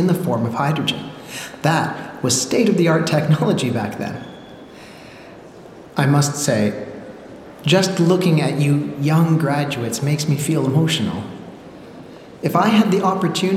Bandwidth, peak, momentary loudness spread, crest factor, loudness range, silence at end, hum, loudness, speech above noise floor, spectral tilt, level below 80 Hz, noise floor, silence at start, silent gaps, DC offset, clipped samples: 15.5 kHz; -2 dBFS; 23 LU; 18 dB; 5 LU; 0 s; none; -18 LUFS; 22 dB; -5.5 dB/octave; -58 dBFS; -40 dBFS; 0 s; none; under 0.1%; under 0.1%